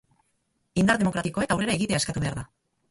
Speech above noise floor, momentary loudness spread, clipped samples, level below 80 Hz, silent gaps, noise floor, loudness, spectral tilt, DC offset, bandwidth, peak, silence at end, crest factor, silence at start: 48 dB; 10 LU; under 0.1%; -50 dBFS; none; -73 dBFS; -25 LUFS; -5 dB/octave; under 0.1%; 11.5 kHz; -6 dBFS; 0.45 s; 20 dB; 0.75 s